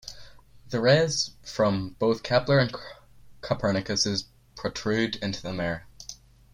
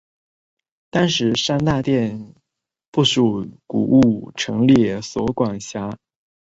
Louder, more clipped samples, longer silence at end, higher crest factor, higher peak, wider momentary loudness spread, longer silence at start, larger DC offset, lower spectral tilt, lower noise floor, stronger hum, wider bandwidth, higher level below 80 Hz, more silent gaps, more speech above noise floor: second, -26 LUFS vs -19 LUFS; neither; about the same, 0.4 s vs 0.5 s; about the same, 20 dB vs 16 dB; second, -8 dBFS vs -2 dBFS; first, 21 LU vs 13 LU; second, 0.05 s vs 0.95 s; neither; about the same, -4.5 dB/octave vs -5.5 dB/octave; second, -48 dBFS vs -77 dBFS; neither; first, 15 kHz vs 8 kHz; second, -54 dBFS vs -48 dBFS; second, none vs 2.88-2.93 s; second, 22 dB vs 59 dB